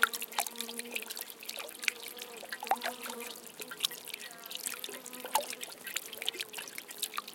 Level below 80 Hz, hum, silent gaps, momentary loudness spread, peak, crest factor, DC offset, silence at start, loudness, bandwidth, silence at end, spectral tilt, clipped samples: -88 dBFS; none; none; 8 LU; -6 dBFS; 34 dB; under 0.1%; 0 s; -37 LUFS; 17 kHz; 0 s; 1 dB/octave; under 0.1%